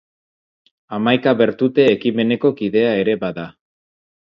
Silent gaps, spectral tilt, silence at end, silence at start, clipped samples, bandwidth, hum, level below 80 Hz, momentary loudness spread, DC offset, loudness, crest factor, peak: none; -8 dB/octave; 0.7 s; 0.9 s; under 0.1%; 6.8 kHz; none; -60 dBFS; 12 LU; under 0.1%; -17 LUFS; 18 dB; 0 dBFS